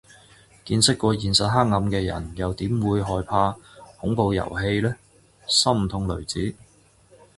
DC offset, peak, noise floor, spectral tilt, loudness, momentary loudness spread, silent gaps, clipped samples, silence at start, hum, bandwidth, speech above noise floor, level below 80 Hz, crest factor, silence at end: under 0.1%; -4 dBFS; -55 dBFS; -4.5 dB/octave; -23 LUFS; 10 LU; none; under 0.1%; 0.65 s; none; 11.5 kHz; 33 dB; -42 dBFS; 20 dB; 0.85 s